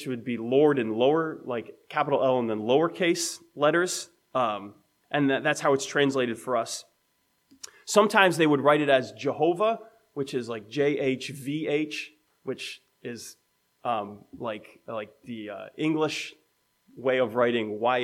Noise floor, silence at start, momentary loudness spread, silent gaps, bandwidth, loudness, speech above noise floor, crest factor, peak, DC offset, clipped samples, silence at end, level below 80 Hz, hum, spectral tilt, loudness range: -71 dBFS; 0 s; 17 LU; none; 15.5 kHz; -26 LUFS; 45 dB; 24 dB; -4 dBFS; under 0.1%; under 0.1%; 0 s; -78 dBFS; none; -4.5 dB/octave; 9 LU